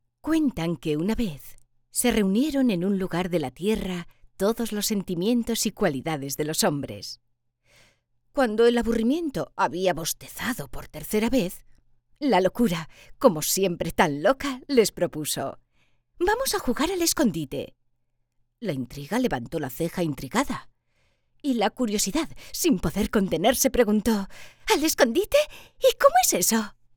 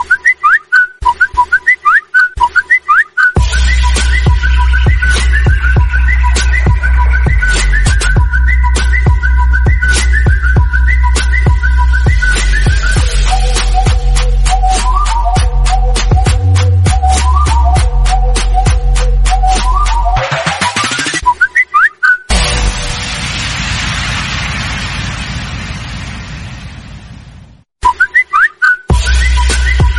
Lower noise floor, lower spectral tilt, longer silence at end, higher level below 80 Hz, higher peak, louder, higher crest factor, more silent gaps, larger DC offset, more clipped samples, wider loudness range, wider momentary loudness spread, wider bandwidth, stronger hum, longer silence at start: first, -71 dBFS vs -37 dBFS; about the same, -4 dB/octave vs -4 dB/octave; first, 0.25 s vs 0 s; second, -46 dBFS vs -12 dBFS; about the same, -2 dBFS vs 0 dBFS; second, -25 LUFS vs -11 LUFS; first, 22 dB vs 10 dB; neither; neither; neither; about the same, 5 LU vs 7 LU; first, 12 LU vs 7 LU; first, over 20 kHz vs 11.5 kHz; neither; first, 0.25 s vs 0 s